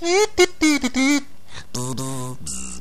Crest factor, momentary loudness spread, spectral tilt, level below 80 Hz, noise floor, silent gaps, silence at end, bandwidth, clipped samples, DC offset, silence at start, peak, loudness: 18 dB; 15 LU; -3.5 dB/octave; -46 dBFS; -40 dBFS; none; 0 s; 14 kHz; under 0.1%; 3%; 0 s; -2 dBFS; -21 LUFS